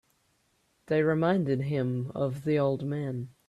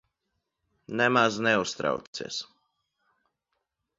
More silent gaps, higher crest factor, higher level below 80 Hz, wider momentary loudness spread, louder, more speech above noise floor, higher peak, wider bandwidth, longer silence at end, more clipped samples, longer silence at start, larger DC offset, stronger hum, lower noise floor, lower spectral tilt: second, none vs 2.07-2.13 s; second, 16 dB vs 22 dB; about the same, -66 dBFS vs -70 dBFS; second, 7 LU vs 14 LU; about the same, -29 LUFS vs -27 LUFS; second, 43 dB vs 55 dB; second, -14 dBFS vs -8 dBFS; first, 12 kHz vs 7.8 kHz; second, 0.2 s vs 1.55 s; neither; about the same, 0.9 s vs 0.9 s; neither; neither; second, -71 dBFS vs -81 dBFS; first, -9 dB/octave vs -4 dB/octave